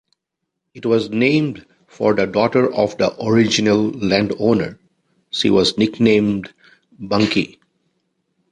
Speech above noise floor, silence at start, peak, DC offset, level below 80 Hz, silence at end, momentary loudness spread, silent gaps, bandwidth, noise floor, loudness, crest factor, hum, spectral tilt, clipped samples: 62 dB; 0.75 s; -2 dBFS; under 0.1%; -52 dBFS; 1.05 s; 12 LU; none; 10.5 kHz; -78 dBFS; -17 LUFS; 18 dB; none; -5.5 dB/octave; under 0.1%